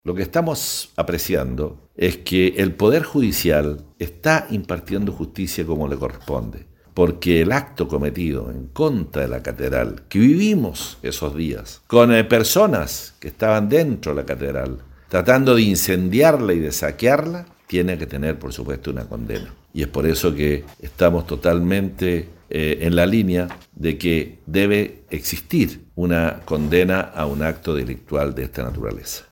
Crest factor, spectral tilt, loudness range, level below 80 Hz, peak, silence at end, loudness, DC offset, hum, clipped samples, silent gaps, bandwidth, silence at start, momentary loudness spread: 20 dB; -5.5 dB/octave; 5 LU; -36 dBFS; 0 dBFS; 0.1 s; -20 LUFS; under 0.1%; none; under 0.1%; none; 17 kHz; 0.05 s; 13 LU